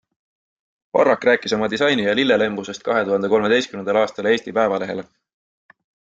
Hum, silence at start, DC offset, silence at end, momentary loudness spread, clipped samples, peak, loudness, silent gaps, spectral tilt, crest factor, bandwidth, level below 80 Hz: none; 0.95 s; under 0.1%; 1.15 s; 6 LU; under 0.1%; -4 dBFS; -19 LUFS; none; -4.5 dB/octave; 18 dB; 8 kHz; -60 dBFS